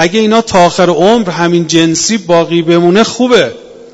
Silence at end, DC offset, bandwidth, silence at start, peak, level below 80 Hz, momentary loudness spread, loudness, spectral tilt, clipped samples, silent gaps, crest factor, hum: 0.1 s; under 0.1%; 8.2 kHz; 0 s; 0 dBFS; -44 dBFS; 3 LU; -9 LUFS; -4.5 dB/octave; 0.8%; none; 8 dB; none